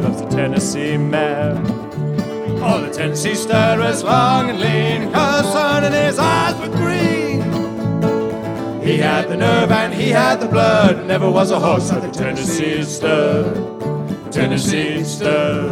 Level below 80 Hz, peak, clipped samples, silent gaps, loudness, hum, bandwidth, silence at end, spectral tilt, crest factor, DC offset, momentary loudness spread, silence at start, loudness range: -46 dBFS; 0 dBFS; under 0.1%; none; -17 LUFS; none; 19 kHz; 0 s; -5.5 dB/octave; 16 dB; under 0.1%; 7 LU; 0 s; 3 LU